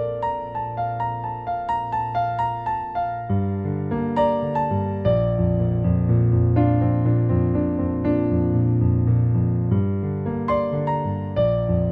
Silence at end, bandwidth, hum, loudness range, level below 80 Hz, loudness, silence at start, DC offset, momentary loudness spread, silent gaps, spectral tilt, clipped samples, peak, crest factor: 0 s; 4.2 kHz; none; 5 LU; -38 dBFS; -22 LUFS; 0 s; under 0.1%; 7 LU; none; -11 dB/octave; under 0.1%; -6 dBFS; 14 dB